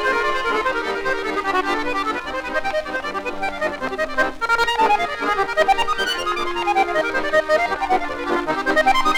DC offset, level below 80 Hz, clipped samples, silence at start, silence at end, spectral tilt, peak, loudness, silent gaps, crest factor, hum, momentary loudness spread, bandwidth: under 0.1%; -40 dBFS; under 0.1%; 0 s; 0 s; -3 dB/octave; -4 dBFS; -20 LUFS; none; 16 dB; none; 7 LU; 18.5 kHz